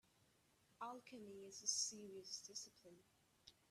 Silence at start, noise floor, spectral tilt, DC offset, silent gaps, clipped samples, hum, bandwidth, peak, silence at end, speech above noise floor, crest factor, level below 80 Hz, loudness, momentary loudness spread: 0.8 s; -78 dBFS; -0.5 dB/octave; under 0.1%; none; under 0.1%; none; 14 kHz; -28 dBFS; 0.2 s; 26 dB; 26 dB; under -90 dBFS; -48 LUFS; 26 LU